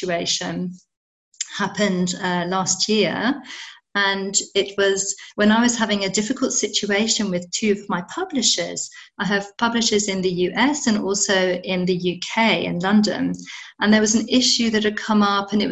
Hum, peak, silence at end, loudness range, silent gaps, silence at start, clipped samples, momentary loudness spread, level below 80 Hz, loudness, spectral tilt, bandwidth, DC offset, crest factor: none; -4 dBFS; 0 s; 3 LU; 0.97-1.32 s; 0 s; under 0.1%; 10 LU; -56 dBFS; -20 LUFS; -3 dB/octave; 8.8 kHz; under 0.1%; 18 dB